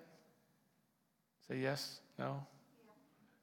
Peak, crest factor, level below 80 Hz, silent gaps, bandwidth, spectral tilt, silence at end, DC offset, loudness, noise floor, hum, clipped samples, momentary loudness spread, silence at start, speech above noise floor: -26 dBFS; 22 dB; under -90 dBFS; none; 17.5 kHz; -5 dB/octave; 0.5 s; under 0.1%; -44 LUFS; -81 dBFS; none; under 0.1%; 16 LU; 0 s; 38 dB